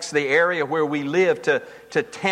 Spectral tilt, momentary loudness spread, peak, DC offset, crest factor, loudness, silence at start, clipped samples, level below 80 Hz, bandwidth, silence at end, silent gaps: -4.5 dB/octave; 7 LU; -6 dBFS; under 0.1%; 14 dB; -21 LUFS; 0 s; under 0.1%; -68 dBFS; 11.5 kHz; 0 s; none